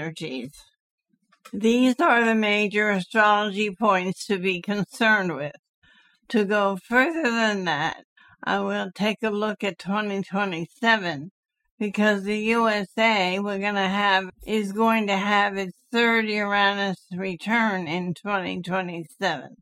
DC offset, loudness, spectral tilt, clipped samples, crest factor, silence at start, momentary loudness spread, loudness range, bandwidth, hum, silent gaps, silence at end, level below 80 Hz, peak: under 0.1%; -23 LUFS; -5 dB/octave; under 0.1%; 18 dB; 0 s; 10 LU; 4 LU; 14.5 kHz; none; 0.80-0.98 s, 5.59-5.63 s, 5.69-5.82 s, 8.04-8.16 s, 11.31-11.43 s, 11.71-11.78 s; 0.05 s; -64 dBFS; -6 dBFS